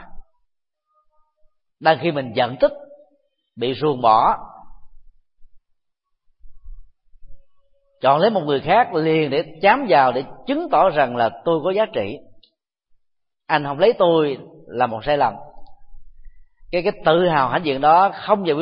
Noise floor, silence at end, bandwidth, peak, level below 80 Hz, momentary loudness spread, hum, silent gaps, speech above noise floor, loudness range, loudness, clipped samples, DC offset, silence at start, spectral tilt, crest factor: -73 dBFS; 0 s; 5.4 kHz; 0 dBFS; -48 dBFS; 10 LU; none; none; 56 dB; 6 LU; -18 LUFS; under 0.1%; under 0.1%; 0 s; -10.5 dB/octave; 20 dB